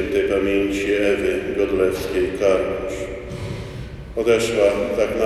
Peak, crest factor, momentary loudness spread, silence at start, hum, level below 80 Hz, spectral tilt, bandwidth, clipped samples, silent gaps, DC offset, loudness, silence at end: -4 dBFS; 16 dB; 12 LU; 0 s; none; -40 dBFS; -5.5 dB/octave; 14 kHz; under 0.1%; none; under 0.1%; -21 LUFS; 0 s